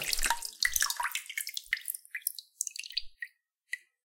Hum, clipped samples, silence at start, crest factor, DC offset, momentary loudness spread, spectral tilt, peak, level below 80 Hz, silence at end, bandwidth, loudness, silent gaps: none; under 0.1%; 0 s; 26 dB; under 0.1%; 13 LU; 2.5 dB/octave; -10 dBFS; -50 dBFS; 0.25 s; 17 kHz; -33 LUFS; none